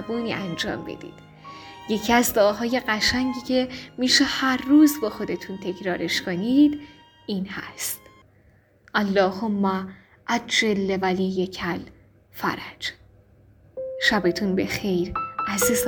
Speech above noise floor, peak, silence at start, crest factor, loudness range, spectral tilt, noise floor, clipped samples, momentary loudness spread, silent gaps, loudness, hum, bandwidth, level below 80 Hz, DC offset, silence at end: 34 dB; -4 dBFS; 0 s; 20 dB; 6 LU; -4 dB/octave; -57 dBFS; under 0.1%; 17 LU; none; -23 LUFS; none; over 20 kHz; -52 dBFS; under 0.1%; 0 s